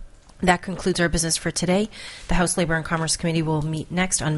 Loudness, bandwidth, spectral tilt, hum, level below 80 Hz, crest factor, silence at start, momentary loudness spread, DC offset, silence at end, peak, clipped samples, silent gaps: -23 LUFS; 11.5 kHz; -4 dB/octave; none; -36 dBFS; 20 dB; 0 s; 5 LU; under 0.1%; 0 s; -4 dBFS; under 0.1%; none